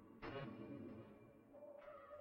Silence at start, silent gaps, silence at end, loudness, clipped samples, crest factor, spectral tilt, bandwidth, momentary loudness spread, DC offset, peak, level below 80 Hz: 0 s; none; 0 s; -56 LUFS; under 0.1%; 16 dB; -8 dB/octave; 16 kHz; 11 LU; under 0.1%; -38 dBFS; -74 dBFS